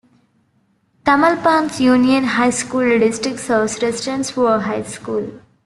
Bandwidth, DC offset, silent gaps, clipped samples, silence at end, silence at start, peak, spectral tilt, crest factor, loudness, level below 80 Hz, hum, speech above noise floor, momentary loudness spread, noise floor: 12 kHz; under 0.1%; none; under 0.1%; 0.3 s; 1.05 s; -2 dBFS; -4 dB/octave; 16 dB; -17 LUFS; -56 dBFS; none; 45 dB; 10 LU; -61 dBFS